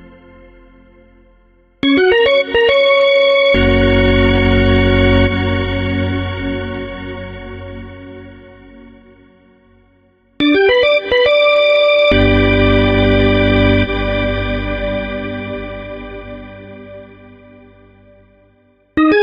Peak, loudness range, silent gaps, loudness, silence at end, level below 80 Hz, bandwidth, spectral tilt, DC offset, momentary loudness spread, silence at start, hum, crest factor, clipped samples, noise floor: -2 dBFS; 17 LU; none; -13 LUFS; 0 s; -26 dBFS; 7.2 kHz; -8 dB/octave; under 0.1%; 20 LU; 1.85 s; none; 12 dB; under 0.1%; -53 dBFS